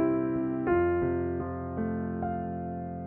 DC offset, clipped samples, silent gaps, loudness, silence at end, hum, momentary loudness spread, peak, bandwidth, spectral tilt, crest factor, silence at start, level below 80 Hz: under 0.1%; under 0.1%; none; -30 LUFS; 0 s; none; 9 LU; -16 dBFS; 3 kHz; -9.5 dB/octave; 14 dB; 0 s; -50 dBFS